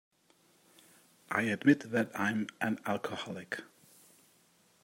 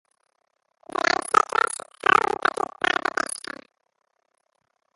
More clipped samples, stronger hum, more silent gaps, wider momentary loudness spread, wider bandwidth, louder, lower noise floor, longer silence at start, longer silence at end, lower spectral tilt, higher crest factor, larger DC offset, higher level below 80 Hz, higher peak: neither; neither; neither; about the same, 13 LU vs 13 LU; first, 16 kHz vs 12 kHz; second, -33 LUFS vs -23 LUFS; second, -68 dBFS vs -74 dBFS; first, 1.3 s vs 1 s; second, 1.2 s vs 1.6 s; first, -5.5 dB/octave vs -1.5 dB/octave; about the same, 24 dB vs 24 dB; neither; second, -80 dBFS vs -66 dBFS; second, -12 dBFS vs -2 dBFS